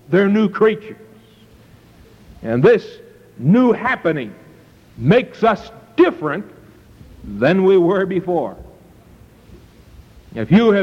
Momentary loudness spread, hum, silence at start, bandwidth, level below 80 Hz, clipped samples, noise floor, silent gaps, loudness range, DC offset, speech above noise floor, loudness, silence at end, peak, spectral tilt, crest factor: 19 LU; none; 0.1 s; 7.4 kHz; -48 dBFS; under 0.1%; -47 dBFS; none; 2 LU; under 0.1%; 32 dB; -16 LUFS; 0 s; -2 dBFS; -8.5 dB/octave; 16 dB